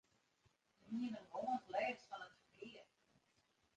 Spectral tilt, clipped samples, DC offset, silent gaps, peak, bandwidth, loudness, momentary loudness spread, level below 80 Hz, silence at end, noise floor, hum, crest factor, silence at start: -5 dB/octave; under 0.1%; under 0.1%; none; -30 dBFS; 9.2 kHz; -46 LUFS; 16 LU; -88 dBFS; 0.95 s; -80 dBFS; none; 20 dB; 0.85 s